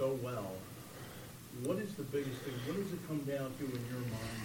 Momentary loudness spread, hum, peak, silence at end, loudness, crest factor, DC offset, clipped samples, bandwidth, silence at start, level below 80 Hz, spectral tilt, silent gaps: 11 LU; none; -24 dBFS; 0 s; -41 LUFS; 16 dB; under 0.1%; under 0.1%; 17 kHz; 0 s; -64 dBFS; -6 dB/octave; none